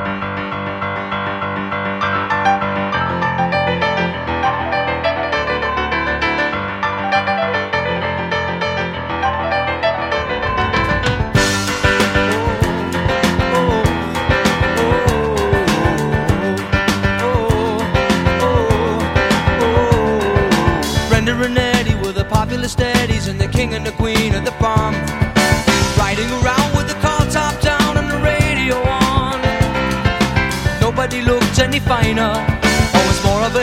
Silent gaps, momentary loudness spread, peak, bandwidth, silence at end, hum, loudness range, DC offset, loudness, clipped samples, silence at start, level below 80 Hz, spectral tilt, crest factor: none; 5 LU; 0 dBFS; 16.5 kHz; 0 s; none; 3 LU; under 0.1%; -16 LUFS; under 0.1%; 0 s; -28 dBFS; -5 dB/octave; 16 dB